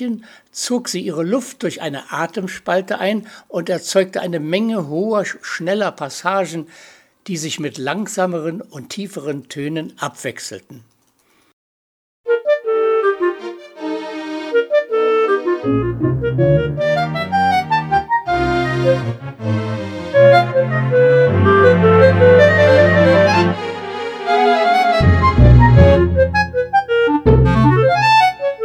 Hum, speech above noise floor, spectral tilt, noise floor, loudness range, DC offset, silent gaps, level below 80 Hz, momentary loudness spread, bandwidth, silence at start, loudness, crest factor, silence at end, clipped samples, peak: none; 38 dB; -6.5 dB/octave; -58 dBFS; 13 LU; under 0.1%; 11.53-12.24 s; -30 dBFS; 15 LU; 13.5 kHz; 0 s; -15 LUFS; 16 dB; 0 s; under 0.1%; 0 dBFS